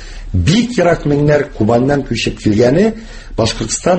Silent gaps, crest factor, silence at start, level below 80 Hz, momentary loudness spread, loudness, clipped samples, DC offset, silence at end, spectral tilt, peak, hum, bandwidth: none; 14 dB; 0 s; -30 dBFS; 6 LU; -14 LUFS; under 0.1%; under 0.1%; 0 s; -5.5 dB/octave; 0 dBFS; none; 8.8 kHz